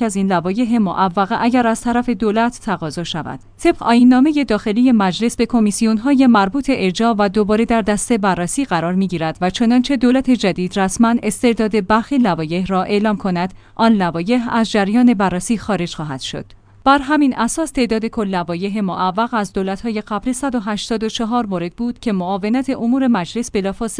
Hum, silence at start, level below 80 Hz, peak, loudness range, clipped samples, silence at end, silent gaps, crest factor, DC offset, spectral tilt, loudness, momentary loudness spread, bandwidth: none; 0 s; -42 dBFS; 0 dBFS; 5 LU; under 0.1%; 0 s; none; 16 dB; under 0.1%; -5.5 dB/octave; -17 LUFS; 8 LU; 10.5 kHz